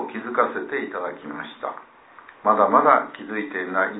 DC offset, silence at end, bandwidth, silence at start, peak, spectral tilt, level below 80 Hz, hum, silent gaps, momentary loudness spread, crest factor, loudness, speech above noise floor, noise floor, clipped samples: under 0.1%; 0 s; 4 kHz; 0 s; -2 dBFS; -9 dB/octave; -74 dBFS; none; none; 17 LU; 22 dB; -22 LUFS; 25 dB; -48 dBFS; under 0.1%